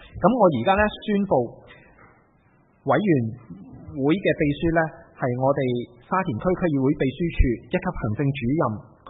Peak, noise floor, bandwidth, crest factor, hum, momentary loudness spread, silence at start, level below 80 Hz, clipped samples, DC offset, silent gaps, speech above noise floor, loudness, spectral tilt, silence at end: -4 dBFS; -59 dBFS; 4 kHz; 20 dB; none; 10 LU; 0 s; -38 dBFS; under 0.1%; under 0.1%; none; 37 dB; -23 LUFS; -12 dB/octave; 0 s